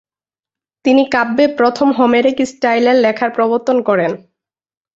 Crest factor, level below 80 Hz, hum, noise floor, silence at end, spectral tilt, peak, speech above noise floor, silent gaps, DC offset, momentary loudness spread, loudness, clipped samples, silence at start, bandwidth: 14 dB; -60 dBFS; none; under -90 dBFS; 0.8 s; -5 dB/octave; -2 dBFS; over 77 dB; none; under 0.1%; 5 LU; -14 LUFS; under 0.1%; 0.85 s; 8 kHz